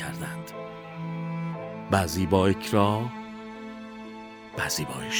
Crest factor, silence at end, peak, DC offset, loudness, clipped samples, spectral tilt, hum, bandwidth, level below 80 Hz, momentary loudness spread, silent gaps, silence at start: 22 dB; 0 s; -6 dBFS; under 0.1%; -27 LUFS; under 0.1%; -5 dB/octave; none; over 20 kHz; -54 dBFS; 17 LU; none; 0 s